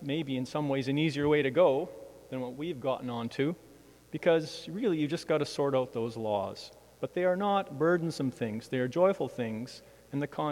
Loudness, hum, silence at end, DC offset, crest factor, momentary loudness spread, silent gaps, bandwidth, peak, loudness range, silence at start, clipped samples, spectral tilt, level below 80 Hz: -31 LUFS; none; 0 s; under 0.1%; 18 dB; 13 LU; none; 16 kHz; -12 dBFS; 2 LU; 0 s; under 0.1%; -6.5 dB/octave; -66 dBFS